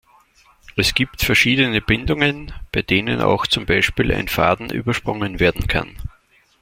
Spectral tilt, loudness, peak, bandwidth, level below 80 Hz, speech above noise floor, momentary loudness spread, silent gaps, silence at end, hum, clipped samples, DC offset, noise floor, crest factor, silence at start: -4.5 dB/octave; -18 LUFS; -2 dBFS; 16.5 kHz; -34 dBFS; 35 dB; 10 LU; none; 0.5 s; none; under 0.1%; under 0.1%; -53 dBFS; 18 dB; 0.75 s